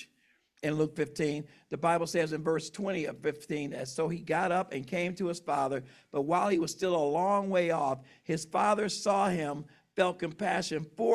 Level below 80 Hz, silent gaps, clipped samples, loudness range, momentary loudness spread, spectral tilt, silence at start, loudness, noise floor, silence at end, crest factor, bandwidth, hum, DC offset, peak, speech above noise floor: -70 dBFS; none; under 0.1%; 3 LU; 9 LU; -5 dB/octave; 0 s; -31 LUFS; -70 dBFS; 0 s; 16 dB; 14 kHz; none; under 0.1%; -14 dBFS; 40 dB